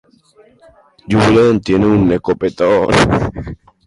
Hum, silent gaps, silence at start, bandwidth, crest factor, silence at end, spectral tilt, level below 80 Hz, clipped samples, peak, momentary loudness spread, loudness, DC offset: none; none; 1.1 s; 11.5 kHz; 14 dB; 0.3 s; -6.5 dB/octave; -34 dBFS; under 0.1%; 0 dBFS; 9 LU; -13 LUFS; under 0.1%